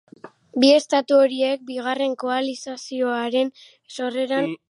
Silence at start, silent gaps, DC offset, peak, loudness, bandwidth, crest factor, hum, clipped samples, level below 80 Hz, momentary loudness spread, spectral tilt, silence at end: 0.25 s; none; under 0.1%; -4 dBFS; -21 LUFS; 11.5 kHz; 18 dB; none; under 0.1%; -80 dBFS; 14 LU; -3.5 dB/octave; 0.15 s